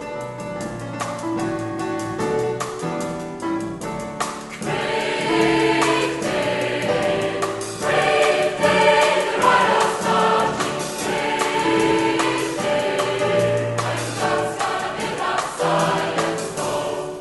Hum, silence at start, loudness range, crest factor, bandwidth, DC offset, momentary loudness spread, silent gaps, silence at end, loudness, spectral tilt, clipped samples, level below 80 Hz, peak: none; 0 s; 8 LU; 18 dB; 12 kHz; under 0.1%; 10 LU; none; 0 s; -21 LUFS; -4 dB/octave; under 0.1%; -52 dBFS; -4 dBFS